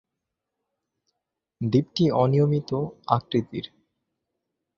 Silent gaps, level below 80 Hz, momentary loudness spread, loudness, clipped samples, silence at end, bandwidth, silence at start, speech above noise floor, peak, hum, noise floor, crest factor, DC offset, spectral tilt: none; -60 dBFS; 14 LU; -24 LUFS; under 0.1%; 1.1 s; 6.8 kHz; 1.6 s; 61 dB; -6 dBFS; none; -84 dBFS; 22 dB; under 0.1%; -8.5 dB/octave